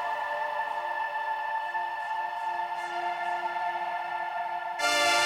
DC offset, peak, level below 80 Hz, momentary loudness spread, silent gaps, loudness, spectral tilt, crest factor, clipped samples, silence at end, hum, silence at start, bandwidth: under 0.1%; -14 dBFS; -74 dBFS; 5 LU; none; -30 LUFS; 0 dB/octave; 16 dB; under 0.1%; 0 s; none; 0 s; 17 kHz